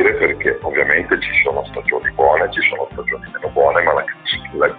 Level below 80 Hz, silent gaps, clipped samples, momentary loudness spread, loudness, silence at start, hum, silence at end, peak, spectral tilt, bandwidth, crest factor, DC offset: -42 dBFS; none; under 0.1%; 8 LU; -16 LUFS; 0 s; none; 0 s; 0 dBFS; -1.5 dB/octave; 4.8 kHz; 16 dB; under 0.1%